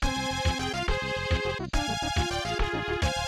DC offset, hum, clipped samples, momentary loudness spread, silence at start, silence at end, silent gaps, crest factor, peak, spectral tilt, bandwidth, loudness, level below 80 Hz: under 0.1%; none; under 0.1%; 1 LU; 0 s; 0 s; none; 14 dB; -14 dBFS; -4 dB/octave; 15 kHz; -29 LUFS; -34 dBFS